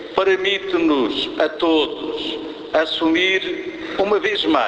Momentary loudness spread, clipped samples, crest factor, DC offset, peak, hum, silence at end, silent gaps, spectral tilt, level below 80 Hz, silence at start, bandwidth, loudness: 9 LU; under 0.1%; 18 dB; under 0.1%; -2 dBFS; none; 0 s; none; -4 dB/octave; -54 dBFS; 0 s; 8 kHz; -19 LUFS